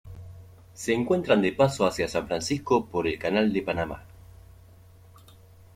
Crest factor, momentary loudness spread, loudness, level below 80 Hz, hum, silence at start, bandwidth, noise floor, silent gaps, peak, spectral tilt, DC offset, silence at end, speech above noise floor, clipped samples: 20 dB; 14 LU; -26 LUFS; -54 dBFS; none; 0.05 s; 16 kHz; -52 dBFS; none; -8 dBFS; -5.5 dB/octave; under 0.1%; 1.7 s; 27 dB; under 0.1%